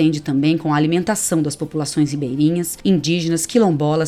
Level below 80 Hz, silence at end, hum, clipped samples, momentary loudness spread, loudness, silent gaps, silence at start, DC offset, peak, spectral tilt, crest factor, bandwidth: -52 dBFS; 0 s; none; under 0.1%; 4 LU; -18 LUFS; none; 0 s; under 0.1%; -2 dBFS; -5.5 dB/octave; 14 dB; 14.5 kHz